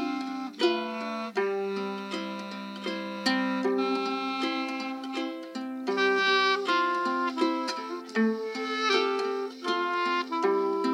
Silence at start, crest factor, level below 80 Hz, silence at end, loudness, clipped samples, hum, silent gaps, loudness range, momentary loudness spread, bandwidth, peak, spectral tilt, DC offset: 0 s; 16 dB; under -90 dBFS; 0 s; -28 LUFS; under 0.1%; none; none; 4 LU; 10 LU; 14 kHz; -12 dBFS; -4 dB/octave; under 0.1%